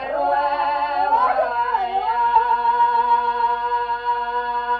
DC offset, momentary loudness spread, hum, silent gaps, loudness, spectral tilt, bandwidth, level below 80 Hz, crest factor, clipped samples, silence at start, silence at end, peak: under 0.1%; 5 LU; 50 Hz at -50 dBFS; none; -19 LUFS; -4.5 dB/octave; 5.2 kHz; -52 dBFS; 14 dB; under 0.1%; 0 s; 0 s; -4 dBFS